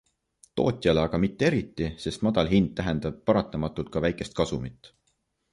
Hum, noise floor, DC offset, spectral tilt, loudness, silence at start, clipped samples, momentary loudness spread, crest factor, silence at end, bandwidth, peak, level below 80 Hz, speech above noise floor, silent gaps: none; -74 dBFS; under 0.1%; -6.5 dB/octave; -27 LUFS; 0.55 s; under 0.1%; 8 LU; 20 dB; 0.65 s; 11.5 kHz; -8 dBFS; -46 dBFS; 48 dB; none